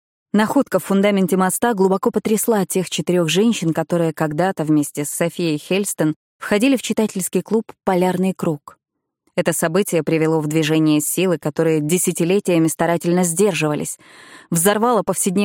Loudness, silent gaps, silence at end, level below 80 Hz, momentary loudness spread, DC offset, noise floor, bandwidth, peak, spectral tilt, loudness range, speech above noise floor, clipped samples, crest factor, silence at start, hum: -18 LUFS; 6.16-6.40 s; 0 s; -62 dBFS; 6 LU; under 0.1%; -68 dBFS; 17 kHz; -4 dBFS; -5 dB/octave; 3 LU; 50 dB; under 0.1%; 14 dB; 0.35 s; none